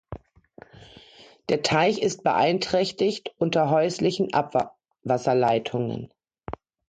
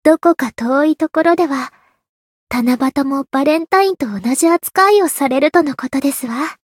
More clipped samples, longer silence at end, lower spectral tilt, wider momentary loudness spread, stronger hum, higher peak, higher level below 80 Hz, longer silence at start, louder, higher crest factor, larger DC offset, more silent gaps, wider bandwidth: neither; first, 0.4 s vs 0.15 s; first, -5 dB/octave vs -3.5 dB/octave; first, 19 LU vs 7 LU; neither; second, -8 dBFS vs 0 dBFS; about the same, -56 dBFS vs -56 dBFS; about the same, 0.1 s vs 0.05 s; second, -24 LUFS vs -15 LUFS; about the same, 18 dB vs 14 dB; neither; second, none vs 2.09-2.47 s; second, 9.4 kHz vs 17 kHz